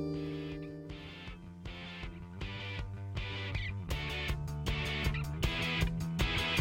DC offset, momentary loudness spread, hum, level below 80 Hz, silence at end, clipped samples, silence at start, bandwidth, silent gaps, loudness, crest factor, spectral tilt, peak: under 0.1%; 13 LU; none; -42 dBFS; 0 s; under 0.1%; 0 s; 16.5 kHz; none; -37 LUFS; 20 dB; -5 dB/octave; -18 dBFS